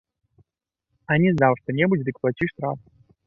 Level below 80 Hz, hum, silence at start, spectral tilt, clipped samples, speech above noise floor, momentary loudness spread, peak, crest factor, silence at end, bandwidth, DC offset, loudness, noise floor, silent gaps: -58 dBFS; none; 1.1 s; -9.5 dB/octave; under 0.1%; 61 dB; 12 LU; -4 dBFS; 20 dB; 0.5 s; 6 kHz; under 0.1%; -22 LUFS; -83 dBFS; none